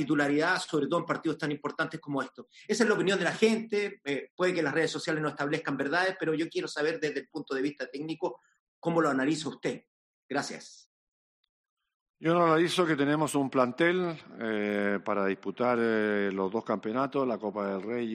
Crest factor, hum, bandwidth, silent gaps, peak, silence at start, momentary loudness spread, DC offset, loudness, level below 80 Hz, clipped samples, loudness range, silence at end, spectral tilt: 18 dB; none; 11.5 kHz; 4.30-4.38 s, 8.60-8.82 s, 9.87-10.29 s, 10.86-11.43 s, 11.49-11.77 s, 11.94-12.14 s; -12 dBFS; 0 s; 9 LU; under 0.1%; -30 LUFS; -76 dBFS; under 0.1%; 5 LU; 0 s; -5 dB/octave